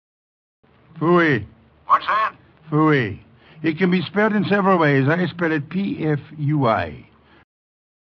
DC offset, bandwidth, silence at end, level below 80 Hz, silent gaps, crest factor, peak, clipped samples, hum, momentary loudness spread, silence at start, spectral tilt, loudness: under 0.1%; 6.2 kHz; 1 s; -58 dBFS; none; 16 dB; -4 dBFS; under 0.1%; none; 9 LU; 0.95 s; -8.5 dB/octave; -19 LUFS